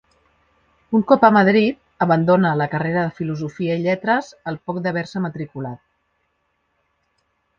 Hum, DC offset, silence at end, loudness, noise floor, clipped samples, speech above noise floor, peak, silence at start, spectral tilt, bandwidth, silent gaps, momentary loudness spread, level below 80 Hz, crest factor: none; under 0.1%; 1.85 s; -19 LUFS; -69 dBFS; under 0.1%; 51 dB; 0 dBFS; 0.9 s; -8 dB/octave; 7.4 kHz; none; 16 LU; -58 dBFS; 20 dB